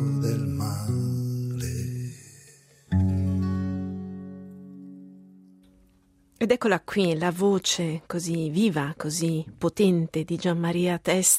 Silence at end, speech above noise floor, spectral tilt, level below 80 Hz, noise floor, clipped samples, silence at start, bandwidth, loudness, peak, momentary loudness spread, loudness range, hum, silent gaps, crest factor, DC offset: 0 s; 37 dB; -5 dB/octave; -58 dBFS; -61 dBFS; under 0.1%; 0 s; 16 kHz; -26 LUFS; -6 dBFS; 16 LU; 6 LU; none; none; 20 dB; under 0.1%